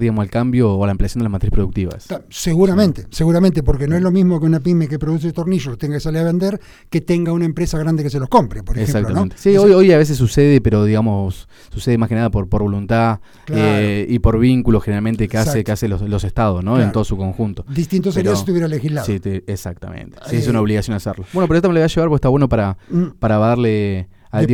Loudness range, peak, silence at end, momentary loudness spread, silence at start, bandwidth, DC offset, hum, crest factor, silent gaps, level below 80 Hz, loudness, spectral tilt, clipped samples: 6 LU; 0 dBFS; 0 s; 9 LU; 0 s; 17 kHz; under 0.1%; none; 16 dB; none; -30 dBFS; -16 LUFS; -7.5 dB/octave; under 0.1%